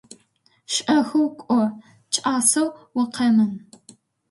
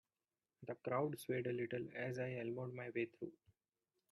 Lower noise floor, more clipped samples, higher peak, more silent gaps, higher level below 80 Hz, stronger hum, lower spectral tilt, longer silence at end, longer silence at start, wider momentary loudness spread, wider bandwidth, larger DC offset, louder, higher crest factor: second, -63 dBFS vs under -90 dBFS; neither; first, -6 dBFS vs -26 dBFS; neither; first, -70 dBFS vs -84 dBFS; neither; second, -3 dB/octave vs -7 dB/octave; about the same, 0.7 s vs 0.75 s; about the same, 0.7 s vs 0.6 s; second, 8 LU vs 11 LU; about the same, 12 kHz vs 11.5 kHz; neither; first, -21 LUFS vs -44 LUFS; about the same, 18 dB vs 20 dB